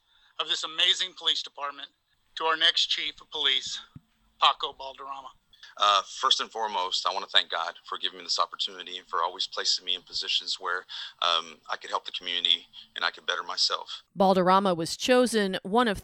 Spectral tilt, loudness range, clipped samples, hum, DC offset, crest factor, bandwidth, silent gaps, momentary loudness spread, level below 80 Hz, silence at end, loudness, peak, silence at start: -2.5 dB/octave; 3 LU; under 0.1%; none; under 0.1%; 24 dB; 18 kHz; none; 14 LU; -64 dBFS; 0 s; -26 LUFS; -4 dBFS; 0.4 s